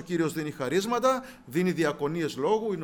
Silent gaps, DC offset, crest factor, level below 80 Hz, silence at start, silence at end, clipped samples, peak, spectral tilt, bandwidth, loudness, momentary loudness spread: none; under 0.1%; 16 dB; -62 dBFS; 0 s; 0 s; under 0.1%; -12 dBFS; -5.5 dB/octave; over 20 kHz; -28 LUFS; 6 LU